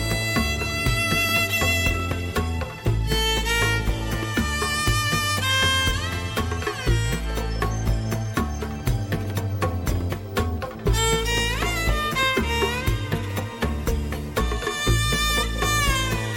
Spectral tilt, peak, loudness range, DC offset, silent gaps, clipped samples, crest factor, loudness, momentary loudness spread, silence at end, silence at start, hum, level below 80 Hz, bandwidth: -4 dB/octave; -8 dBFS; 4 LU; under 0.1%; none; under 0.1%; 14 dB; -23 LUFS; 7 LU; 0 s; 0 s; none; -30 dBFS; 17 kHz